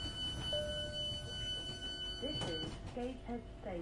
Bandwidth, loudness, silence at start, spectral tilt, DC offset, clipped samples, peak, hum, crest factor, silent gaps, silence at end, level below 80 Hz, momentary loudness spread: 11.5 kHz; -41 LUFS; 0 s; -4 dB/octave; under 0.1%; under 0.1%; -26 dBFS; none; 16 dB; none; 0 s; -52 dBFS; 7 LU